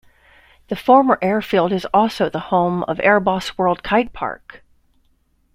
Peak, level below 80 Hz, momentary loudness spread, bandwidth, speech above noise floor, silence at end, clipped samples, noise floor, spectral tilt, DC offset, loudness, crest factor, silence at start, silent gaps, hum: -2 dBFS; -50 dBFS; 12 LU; 16 kHz; 43 dB; 1.2 s; under 0.1%; -61 dBFS; -6.5 dB/octave; under 0.1%; -18 LUFS; 18 dB; 0.7 s; none; none